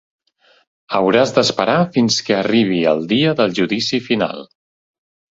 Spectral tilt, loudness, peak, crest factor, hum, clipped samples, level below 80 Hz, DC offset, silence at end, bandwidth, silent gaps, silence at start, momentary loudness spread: -4.5 dB/octave; -16 LUFS; 0 dBFS; 18 dB; none; under 0.1%; -58 dBFS; under 0.1%; 0.85 s; 8 kHz; none; 0.9 s; 5 LU